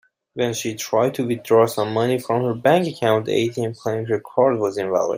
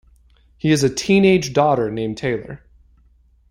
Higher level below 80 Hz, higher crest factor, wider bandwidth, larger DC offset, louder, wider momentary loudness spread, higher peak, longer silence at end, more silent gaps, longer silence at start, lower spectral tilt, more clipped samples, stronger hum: second, -64 dBFS vs -48 dBFS; about the same, 18 dB vs 16 dB; about the same, 16 kHz vs 15.5 kHz; neither; about the same, -20 LUFS vs -18 LUFS; second, 8 LU vs 13 LU; about the same, -2 dBFS vs -2 dBFS; second, 0 s vs 0.95 s; neither; second, 0.35 s vs 0.65 s; about the same, -5.5 dB/octave vs -5.5 dB/octave; neither; neither